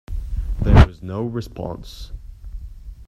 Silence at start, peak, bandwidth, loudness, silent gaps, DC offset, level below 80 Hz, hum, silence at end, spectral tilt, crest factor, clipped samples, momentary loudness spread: 0.1 s; 0 dBFS; 8.8 kHz; -20 LUFS; none; under 0.1%; -24 dBFS; none; 0.05 s; -8 dB/octave; 20 dB; under 0.1%; 25 LU